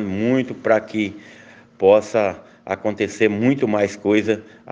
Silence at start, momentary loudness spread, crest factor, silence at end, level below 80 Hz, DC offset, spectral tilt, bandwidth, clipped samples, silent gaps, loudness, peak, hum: 0 s; 10 LU; 18 dB; 0 s; -66 dBFS; under 0.1%; -6.5 dB/octave; 9.4 kHz; under 0.1%; none; -20 LUFS; -2 dBFS; none